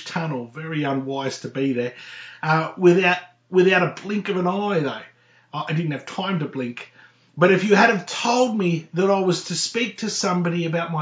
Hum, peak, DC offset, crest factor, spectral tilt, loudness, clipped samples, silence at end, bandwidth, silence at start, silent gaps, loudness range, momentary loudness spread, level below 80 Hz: none; -2 dBFS; under 0.1%; 20 dB; -5 dB/octave; -21 LUFS; under 0.1%; 0 s; 8 kHz; 0 s; none; 4 LU; 14 LU; -74 dBFS